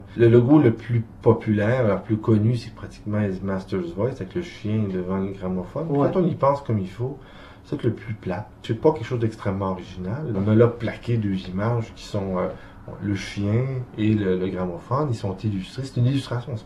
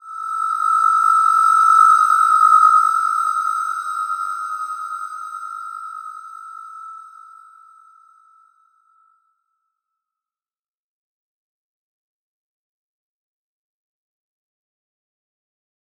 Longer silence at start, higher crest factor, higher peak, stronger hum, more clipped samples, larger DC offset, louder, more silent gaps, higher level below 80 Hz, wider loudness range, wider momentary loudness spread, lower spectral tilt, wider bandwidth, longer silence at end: about the same, 0 s vs 0.05 s; about the same, 20 dB vs 20 dB; about the same, -2 dBFS vs -2 dBFS; neither; neither; neither; second, -24 LUFS vs -15 LUFS; neither; first, -48 dBFS vs under -90 dBFS; second, 4 LU vs 22 LU; second, 12 LU vs 24 LU; first, -8.5 dB/octave vs 7 dB/octave; second, 10.5 kHz vs 15 kHz; second, 0 s vs 8.9 s